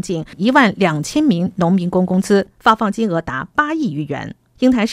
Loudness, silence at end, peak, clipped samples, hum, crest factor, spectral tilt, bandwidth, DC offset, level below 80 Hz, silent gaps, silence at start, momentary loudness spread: -16 LUFS; 0 s; 0 dBFS; under 0.1%; none; 16 dB; -6 dB/octave; 14 kHz; under 0.1%; -48 dBFS; none; 0.05 s; 10 LU